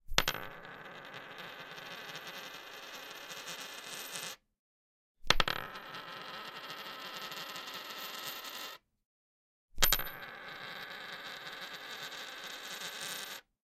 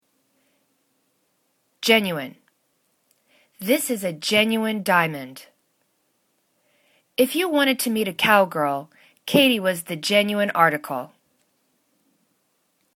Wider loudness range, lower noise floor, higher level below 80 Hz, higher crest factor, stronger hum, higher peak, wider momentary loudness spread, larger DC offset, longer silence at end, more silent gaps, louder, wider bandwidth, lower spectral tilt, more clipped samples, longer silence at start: about the same, 7 LU vs 5 LU; first, under -90 dBFS vs -69 dBFS; first, -50 dBFS vs -70 dBFS; first, 38 dB vs 22 dB; neither; about the same, -2 dBFS vs -2 dBFS; about the same, 15 LU vs 14 LU; neither; second, 0.25 s vs 1.9 s; first, 4.59-5.15 s, 9.05-9.68 s vs none; second, -39 LUFS vs -21 LUFS; second, 16.5 kHz vs 19 kHz; second, -1 dB/octave vs -3.5 dB/octave; neither; second, 0.05 s vs 1.8 s